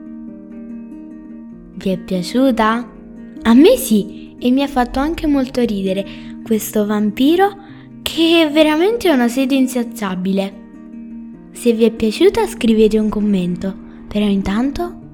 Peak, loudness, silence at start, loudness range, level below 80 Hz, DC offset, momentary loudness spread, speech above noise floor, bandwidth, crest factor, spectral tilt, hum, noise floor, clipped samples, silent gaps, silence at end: 0 dBFS; -16 LUFS; 0 s; 3 LU; -40 dBFS; under 0.1%; 21 LU; 20 dB; 18 kHz; 16 dB; -5.5 dB/octave; none; -34 dBFS; under 0.1%; none; 0.05 s